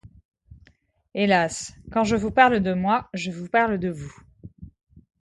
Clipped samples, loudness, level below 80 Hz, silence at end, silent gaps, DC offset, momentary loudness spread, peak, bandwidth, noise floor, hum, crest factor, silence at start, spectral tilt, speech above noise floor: under 0.1%; -22 LUFS; -50 dBFS; 0.55 s; 0.25-0.32 s; under 0.1%; 15 LU; -2 dBFS; 11.5 kHz; -58 dBFS; none; 22 dB; 0.05 s; -5 dB/octave; 36 dB